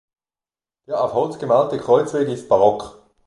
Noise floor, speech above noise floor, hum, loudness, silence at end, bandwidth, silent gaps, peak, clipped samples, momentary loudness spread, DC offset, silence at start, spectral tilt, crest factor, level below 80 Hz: under -90 dBFS; over 72 dB; none; -19 LUFS; 0.35 s; 11.5 kHz; none; -2 dBFS; under 0.1%; 10 LU; under 0.1%; 0.9 s; -6.5 dB/octave; 18 dB; -58 dBFS